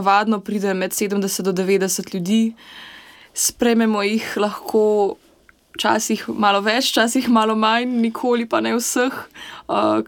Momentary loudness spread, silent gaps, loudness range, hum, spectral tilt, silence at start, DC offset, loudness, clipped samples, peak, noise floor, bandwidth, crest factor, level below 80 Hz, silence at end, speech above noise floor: 12 LU; none; 3 LU; none; -3.5 dB/octave; 0 s; under 0.1%; -19 LUFS; under 0.1%; -2 dBFS; -54 dBFS; 17.5 kHz; 16 dB; -60 dBFS; 0 s; 35 dB